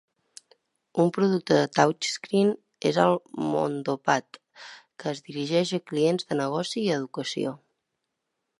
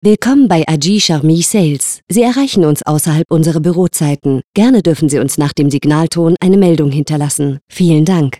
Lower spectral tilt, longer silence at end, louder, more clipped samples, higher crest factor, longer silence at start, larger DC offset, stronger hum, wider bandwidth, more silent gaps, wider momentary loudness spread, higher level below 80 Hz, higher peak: about the same, -5 dB/octave vs -5.5 dB/octave; first, 1.05 s vs 0.05 s; second, -26 LUFS vs -11 LUFS; neither; first, 22 dB vs 10 dB; first, 0.95 s vs 0.05 s; second, under 0.1% vs 0.7%; neither; second, 11.5 kHz vs 15 kHz; second, none vs 2.03-2.07 s, 3.25-3.29 s, 4.44-4.53 s, 7.61-7.67 s; first, 11 LU vs 5 LU; second, -74 dBFS vs -46 dBFS; second, -4 dBFS vs 0 dBFS